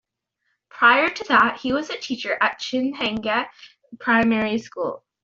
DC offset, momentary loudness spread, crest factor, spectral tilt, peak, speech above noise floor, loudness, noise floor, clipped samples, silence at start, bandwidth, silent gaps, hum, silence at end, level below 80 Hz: under 0.1%; 13 LU; 20 dB; -4 dB/octave; -2 dBFS; 54 dB; -21 LUFS; -75 dBFS; under 0.1%; 0.75 s; 7.6 kHz; none; none; 0.25 s; -58 dBFS